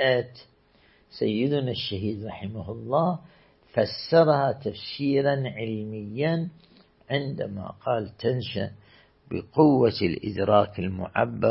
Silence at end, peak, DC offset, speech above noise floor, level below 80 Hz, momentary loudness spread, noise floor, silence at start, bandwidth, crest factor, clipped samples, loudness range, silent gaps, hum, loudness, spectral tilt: 0 s; -6 dBFS; under 0.1%; 35 dB; -58 dBFS; 14 LU; -60 dBFS; 0 s; 5.8 kHz; 20 dB; under 0.1%; 5 LU; none; none; -26 LUFS; -10.5 dB/octave